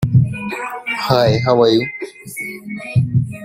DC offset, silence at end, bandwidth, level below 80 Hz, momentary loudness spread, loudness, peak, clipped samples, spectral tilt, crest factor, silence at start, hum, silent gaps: under 0.1%; 0 s; 16 kHz; -44 dBFS; 14 LU; -17 LUFS; -2 dBFS; under 0.1%; -6.5 dB/octave; 16 dB; 0 s; none; none